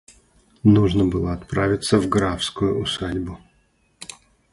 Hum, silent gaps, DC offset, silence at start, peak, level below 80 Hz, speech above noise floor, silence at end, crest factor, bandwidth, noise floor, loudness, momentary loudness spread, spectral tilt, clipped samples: none; none; under 0.1%; 0.65 s; -2 dBFS; -40 dBFS; 43 dB; 0.5 s; 18 dB; 11.5 kHz; -62 dBFS; -21 LUFS; 22 LU; -6 dB/octave; under 0.1%